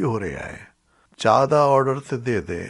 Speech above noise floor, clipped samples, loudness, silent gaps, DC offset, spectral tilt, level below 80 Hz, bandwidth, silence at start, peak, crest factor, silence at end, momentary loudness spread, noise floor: 29 dB; under 0.1%; -20 LUFS; none; under 0.1%; -6.5 dB/octave; -50 dBFS; 11.5 kHz; 0 s; -2 dBFS; 18 dB; 0 s; 17 LU; -49 dBFS